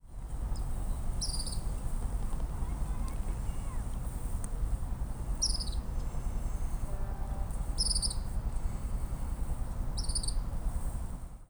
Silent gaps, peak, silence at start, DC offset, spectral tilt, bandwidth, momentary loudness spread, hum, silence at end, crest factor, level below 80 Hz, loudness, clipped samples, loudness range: none; -18 dBFS; 0.05 s; under 0.1%; -3.5 dB/octave; over 20 kHz; 8 LU; none; 0.05 s; 16 dB; -34 dBFS; -37 LUFS; under 0.1%; 3 LU